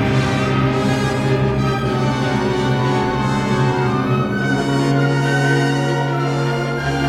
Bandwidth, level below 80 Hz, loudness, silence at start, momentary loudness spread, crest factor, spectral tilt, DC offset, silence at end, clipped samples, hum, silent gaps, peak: 12 kHz; -38 dBFS; -18 LUFS; 0 s; 2 LU; 12 dB; -6.5 dB/octave; under 0.1%; 0 s; under 0.1%; none; none; -4 dBFS